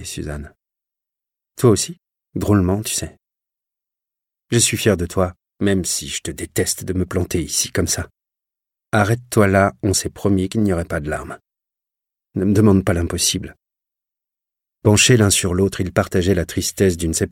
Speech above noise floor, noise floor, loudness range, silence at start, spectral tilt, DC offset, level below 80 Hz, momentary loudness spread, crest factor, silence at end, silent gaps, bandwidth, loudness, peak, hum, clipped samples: 68 dB; -86 dBFS; 4 LU; 0 s; -4.5 dB/octave; under 0.1%; -40 dBFS; 12 LU; 18 dB; 0.05 s; none; 17 kHz; -18 LUFS; -2 dBFS; none; under 0.1%